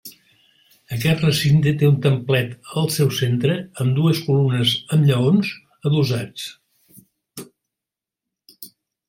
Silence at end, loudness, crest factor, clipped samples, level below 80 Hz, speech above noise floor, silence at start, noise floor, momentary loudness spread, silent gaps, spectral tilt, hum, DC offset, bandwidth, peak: 0.4 s; -19 LUFS; 16 dB; under 0.1%; -54 dBFS; 69 dB; 0.05 s; -87 dBFS; 22 LU; none; -6 dB/octave; none; under 0.1%; 16.5 kHz; -4 dBFS